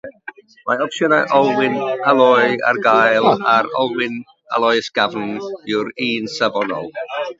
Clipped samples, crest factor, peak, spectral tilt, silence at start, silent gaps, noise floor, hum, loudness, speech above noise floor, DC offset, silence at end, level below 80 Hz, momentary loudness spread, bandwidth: under 0.1%; 16 dB; 0 dBFS; -4.5 dB/octave; 0.05 s; none; -38 dBFS; none; -17 LUFS; 22 dB; under 0.1%; 0.05 s; -66 dBFS; 13 LU; 7.8 kHz